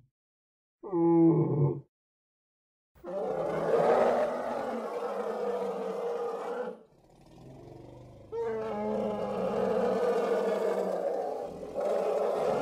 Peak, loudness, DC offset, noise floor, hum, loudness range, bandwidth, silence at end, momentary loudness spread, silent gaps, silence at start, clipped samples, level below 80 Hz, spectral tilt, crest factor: -14 dBFS; -30 LUFS; under 0.1%; -58 dBFS; none; 7 LU; 13 kHz; 0 s; 16 LU; 1.88-2.95 s; 0.85 s; under 0.1%; -66 dBFS; -8 dB/octave; 16 dB